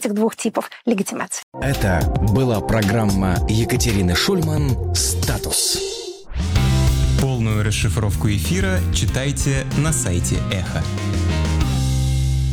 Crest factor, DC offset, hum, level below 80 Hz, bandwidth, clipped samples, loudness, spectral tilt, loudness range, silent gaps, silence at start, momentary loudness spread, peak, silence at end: 12 dB; under 0.1%; none; -26 dBFS; 19 kHz; under 0.1%; -19 LUFS; -5 dB/octave; 2 LU; 1.43-1.52 s; 0 s; 6 LU; -6 dBFS; 0 s